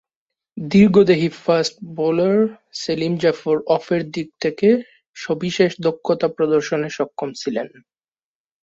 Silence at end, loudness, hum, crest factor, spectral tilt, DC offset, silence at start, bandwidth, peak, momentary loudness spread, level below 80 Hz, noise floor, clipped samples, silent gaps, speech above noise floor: 0.95 s; -19 LUFS; none; 18 dB; -6 dB/octave; under 0.1%; 0.55 s; 8 kHz; -2 dBFS; 12 LU; -56 dBFS; under -90 dBFS; under 0.1%; 5.07-5.14 s; over 72 dB